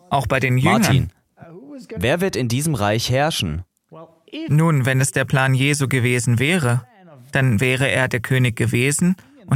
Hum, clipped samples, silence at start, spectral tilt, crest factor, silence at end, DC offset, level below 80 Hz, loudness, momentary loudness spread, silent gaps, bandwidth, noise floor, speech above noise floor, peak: none; under 0.1%; 0.1 s; -5 dB/octave; 18 dB; 0 s; under 0.1%; -44 dBFS; -18 LUFS; 9 LU; none; 16 kHz; -44 dBFS; 26 dB; -2 dBFS